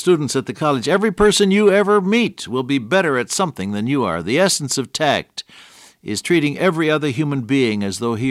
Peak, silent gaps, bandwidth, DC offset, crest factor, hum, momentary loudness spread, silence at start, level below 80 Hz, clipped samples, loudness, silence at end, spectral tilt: -4 dBFS; none; 15.5 kHz; under 0.1%; 14 dB; none; 8 LU; 0 s; -48 dBFS; under 0.1%; -18 LUFS; 0 s; -4.5 dB/octave